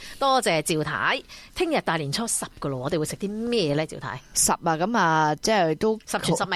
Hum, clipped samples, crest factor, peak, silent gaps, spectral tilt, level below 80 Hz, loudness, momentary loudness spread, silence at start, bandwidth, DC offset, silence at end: none; under 0.1%; 16 dB; -8 dBFS; none; -3.5 dB/octave; -52 dBFS; -24 LUFS; 8 LU; 0 s; 15 kHz; under 0.1%; 0 s